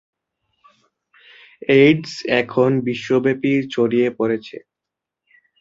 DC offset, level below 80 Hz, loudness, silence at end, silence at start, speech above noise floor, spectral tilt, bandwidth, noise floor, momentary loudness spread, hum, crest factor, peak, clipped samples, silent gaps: under 0.1%; -62 dBFS; -18 LUFS; 1 s; 1.7 s; 67 dB; -6.5 dB/octave; 7.8 kHz; -84 dBFS; 12 LU; none; 18 dB; -2 dBFS; under 0.1%; none